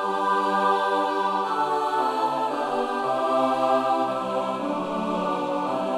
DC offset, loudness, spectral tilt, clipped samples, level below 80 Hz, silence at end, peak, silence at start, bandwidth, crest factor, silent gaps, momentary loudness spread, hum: under 0.1%; -24 LUFS; -5 dB/octave; under 0.1%; -64 dBFS; 0 s; -10 dBFS; 0 s; 16 kHz; 14 dB; none; 5 LU; none